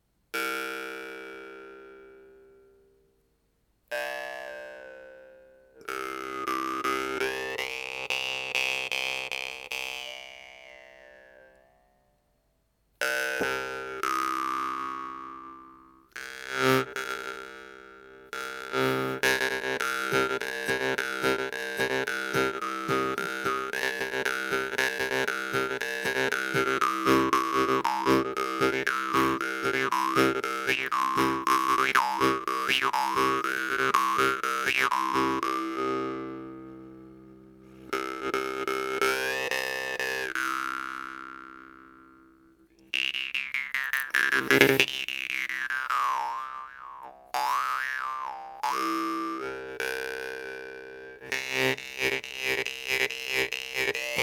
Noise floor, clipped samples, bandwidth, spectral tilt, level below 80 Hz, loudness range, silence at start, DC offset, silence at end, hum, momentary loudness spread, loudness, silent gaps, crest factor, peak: -71 dBFS; under 0.1%; 19.5 kHz; -3 dB/octave; -62 dBFS; 10 LU; 0.35 s; under 0.1%; 0 s; none; 17 LU; -28 LUFS; none; 30 dB; 0 dBFS